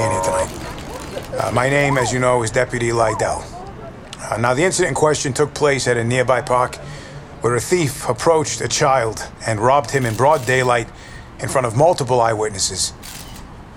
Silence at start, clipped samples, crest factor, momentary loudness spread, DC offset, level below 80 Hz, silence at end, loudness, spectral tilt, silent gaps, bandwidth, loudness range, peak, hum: 0 s; under 0.1%; 16 dB; 17 LU; under 0.1%; -42 dBFS; 0 s; -18 LUFS; -4 dB/octave; none; 17 kHz; 2 LU; -4 dBFS; none